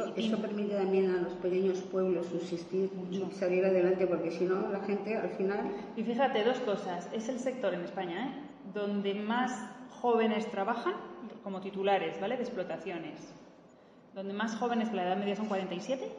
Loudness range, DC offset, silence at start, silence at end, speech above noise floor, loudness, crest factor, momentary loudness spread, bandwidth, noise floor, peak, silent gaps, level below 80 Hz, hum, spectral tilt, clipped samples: 5 LU; under 0.1%; 0 s; 0 s; 25 dB; -33 LUFS; 16 dB; 11 LU; 9.6 kHz; -58 dBFS; -18 dBFS; none; -76 dBFS; none; -6 dB/octave; under 0.1%